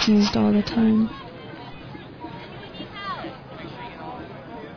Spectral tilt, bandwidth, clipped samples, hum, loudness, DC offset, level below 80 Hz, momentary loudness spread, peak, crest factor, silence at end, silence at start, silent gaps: -6 dB/octave; 5.4 kHz; under 0.1%; none; -22 LUFS; under 0.1%; -50 dBFS; 19 LU; -10 dBFS; 14 dB; 0 s; 0 s; none